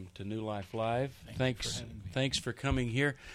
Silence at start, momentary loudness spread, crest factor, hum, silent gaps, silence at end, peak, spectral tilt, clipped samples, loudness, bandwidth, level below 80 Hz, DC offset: 0 s; 7 LU; 18 dB; none; none; 0 s; -16 dBFS; -5 dB/octave; under 0.1%; -35 LUFS; 14.5 kHz; -50 dBFS; under 0.1%